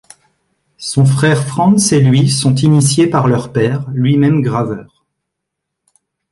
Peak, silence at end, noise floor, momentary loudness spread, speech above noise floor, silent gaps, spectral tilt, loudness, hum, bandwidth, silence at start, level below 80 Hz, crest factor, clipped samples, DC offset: 0 dBFS; 1.5 s; -77 dBFS; 8 LU; 65 dB; none; -5.5 dB/octave; -12 LUFS; none; 11.5 kHz; 0.8 s; -48 dBFS; 12 dB; under 0.1%; under 0.1%